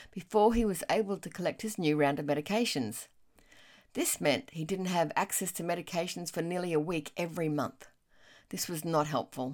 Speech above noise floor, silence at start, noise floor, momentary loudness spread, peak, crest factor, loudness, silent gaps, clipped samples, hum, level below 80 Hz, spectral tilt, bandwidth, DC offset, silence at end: 29 dB; 0 s; -61 dBFS; 9 LU; -14 dBFS; 18 dB; -32 LUFS; none; under 0.1%; none; -54 dBFS; -4.5 dB/octave; 18 kHz; under 0.1%; 0 s